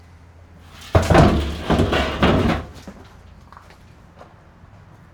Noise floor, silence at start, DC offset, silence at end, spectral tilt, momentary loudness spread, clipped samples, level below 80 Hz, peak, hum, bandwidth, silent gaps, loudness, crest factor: -46 dBFS; 0.8 s; under 0.1%; 0.9 s; -6.5 dB/octave; 25 LU; under 0.1%; -30 dBFS; -2 dBFS; none; 18 kHz; none; -18 LUFS; 18 dB